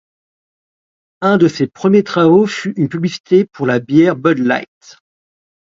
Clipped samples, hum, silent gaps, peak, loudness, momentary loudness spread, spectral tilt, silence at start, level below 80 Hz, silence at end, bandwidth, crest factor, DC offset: under 0.1%; none; 3.20-3.24 s; 0 dBFS; -14 LUFS; 8 LU; -7 dB/octave; 1.2 s; -60 dBFS; 1.05 s; 7.6 kHz; 14 dB; under 0.1%